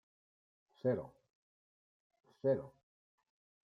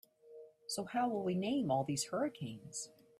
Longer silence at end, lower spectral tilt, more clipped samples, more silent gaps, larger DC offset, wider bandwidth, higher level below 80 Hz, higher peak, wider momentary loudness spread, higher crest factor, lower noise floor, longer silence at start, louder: first, 1.05 s vs 0.3 s; first, -10 dB/octave vs -4.5 dB/octave; neither; first, 1.30-2.10 s vs none; neither; second, 5.6 kHz vs 15 kHz; about the same, -80 dBFS vs -76 dBFS; about the same, -22 dBFS vs -22 dBFS; first, 18 LU vs 14 LU; about the same, 20 dB vs 18 dB; first, under -90 dBFS vs -58 dBFS; first, 0.85 s vs 0.25 s; about the same, -38 LUFS vs -38 LUFS